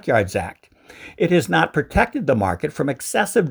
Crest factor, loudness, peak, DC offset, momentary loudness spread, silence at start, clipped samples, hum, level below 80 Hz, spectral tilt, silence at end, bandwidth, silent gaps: 20 dB; -20 LUFS; -2 dBFS; under 0.1%; 10 LU; 0.05 s; under 0.1%; none; -40 dBFS; -5.5 dB/octave; 0 s; over 20 kHz; none